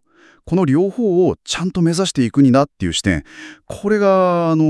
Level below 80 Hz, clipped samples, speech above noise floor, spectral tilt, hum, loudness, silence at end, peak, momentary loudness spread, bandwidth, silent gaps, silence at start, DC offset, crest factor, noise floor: -46 dBFS; under 0.1%; 26 dB; -6 dB/octave; none; -16 LUFS; 0 s; 0 dBFS; 10 LU; 12 kHz; none; 0.45 s; under 0.1%; 16 dB; -42 dBFS